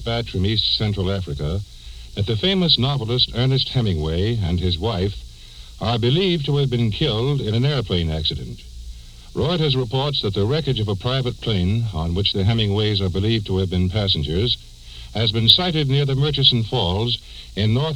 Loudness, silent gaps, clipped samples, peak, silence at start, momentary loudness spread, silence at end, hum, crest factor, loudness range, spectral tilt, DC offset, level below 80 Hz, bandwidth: -20 LUFS; none; under 0.1%; 0 dBFS; 0 s; 11 LU; 0 s; none; 20 dB; 4 LU; -6.5 dB/octave; under 0.1%; -36 dBFS; 12 kHz